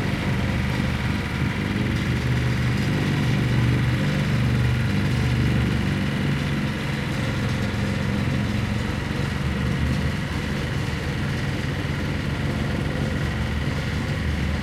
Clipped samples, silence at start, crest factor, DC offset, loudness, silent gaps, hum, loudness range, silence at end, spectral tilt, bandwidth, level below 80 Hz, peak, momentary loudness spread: under 0.1%; 0 s; 14 dB; under 0.1%; -24 LUFS; none; none; 4 LU; 0 s; -6.5 dB/octave; 14.5 kHz; -34 dBFS; -8 dBFS; 4 LU